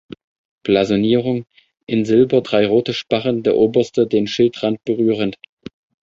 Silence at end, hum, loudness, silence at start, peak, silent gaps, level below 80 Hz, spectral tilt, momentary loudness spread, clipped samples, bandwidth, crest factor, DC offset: 0.7 s; none; -17 LUFS; 0.65 s; -2 dBFS; 1.83-1.87 s; -54 dBFS; -6.5 dB/octave; 8 LU; under 0.1%; 7.6 kHz; 16 dB; under 0.1%